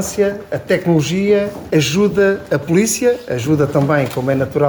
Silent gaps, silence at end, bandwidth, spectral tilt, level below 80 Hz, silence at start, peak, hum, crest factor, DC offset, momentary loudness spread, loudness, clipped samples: none; 0 s; over 20 kHz; -5.5 dB/octave; -46 dBFS; 0 s; -2 dBFS; none; 12 dB; under 0.1%; 5 LU; -16 LUFS; under 0.1%